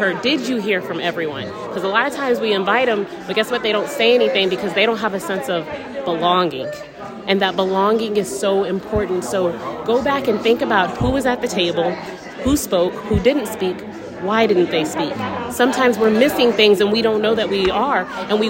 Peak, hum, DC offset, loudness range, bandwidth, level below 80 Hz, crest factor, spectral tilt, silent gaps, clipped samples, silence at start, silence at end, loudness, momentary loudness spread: 0 dBFS; none; under 0.1%; 4 LU; 16.5 kHz; -42 dBFS; 18 dB; -4.5 dB/octave; none; under 0.1%; 0 s; 0 s; -18 LUFS; 9 LU